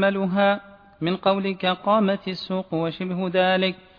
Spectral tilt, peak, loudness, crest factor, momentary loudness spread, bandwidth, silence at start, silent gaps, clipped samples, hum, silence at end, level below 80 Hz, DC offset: -8 dB/octave; -6 dBFS; -23 LUFS; 16 dB; 7 LU; 5.4 kHz; 0 s; none; under 0.1%; none; 0.25 s; -62 dBFS; under 0.1%